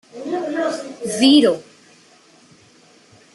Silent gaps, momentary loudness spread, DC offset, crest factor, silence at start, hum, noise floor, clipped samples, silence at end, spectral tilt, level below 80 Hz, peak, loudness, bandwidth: none; 15 LU; under 0.1%; 18 dB; 0.15 s; none; -51 dBFS; under 0.1%; 1.7 s; -3.5 dB/octave; -68 dBFS; -2 dBFS; -18 LUFS; 12 kHz